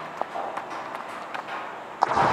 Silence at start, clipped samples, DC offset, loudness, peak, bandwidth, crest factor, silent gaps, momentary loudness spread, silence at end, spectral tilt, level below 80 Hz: 0 s; under 0.1%; under 0.1%; -31 LUFS; -2 dBFS; 14.5 kHz; 26 dB; none; 10 LU; 0 s; -4.5 dB/octave; -60 dBFS